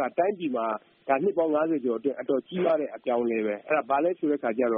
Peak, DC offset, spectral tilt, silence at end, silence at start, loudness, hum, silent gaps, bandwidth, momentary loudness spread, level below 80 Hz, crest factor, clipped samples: -10 dBFS; under 0.1%; -5 dB/octave; 0 s; 0 s; -27 LUFS; none; none; 3.8 kHz; 4 LU; -74 dBFS; 16 dB; under 0.1%